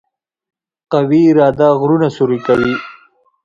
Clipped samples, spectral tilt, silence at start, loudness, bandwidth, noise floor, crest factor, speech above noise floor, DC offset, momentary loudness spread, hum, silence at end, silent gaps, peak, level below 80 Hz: under 0.1%; -8.5 dB/octave; 0.9 s; -13 LUFS; 7.4 kHz; -48 dBFS; 14 dB; 37 dB; under 0.1%; 8 LU; none; 0.55 s; none; 0 dBFS; -50 dBFS